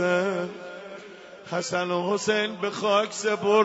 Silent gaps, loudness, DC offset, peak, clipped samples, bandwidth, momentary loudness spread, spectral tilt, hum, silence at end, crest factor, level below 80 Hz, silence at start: none; -26 LUFS; under 0.1%; -8 dBFS; under 0.1%; 8 kHz; 17 LU; -4 dB/octave; none; 0 s; 18 dB; -74 dBFS; 0 s